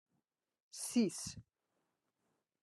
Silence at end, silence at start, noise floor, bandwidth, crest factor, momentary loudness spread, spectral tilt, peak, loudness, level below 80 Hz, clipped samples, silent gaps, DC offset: 1.2 s; 0.75 s; -86 dBFS; 12.5 kHz; 22 dB; 19 LU; -4 dB/octave; -22 dBFS; -38 LUFS; -76 dBFS; under 0.1%; none; under 0.1%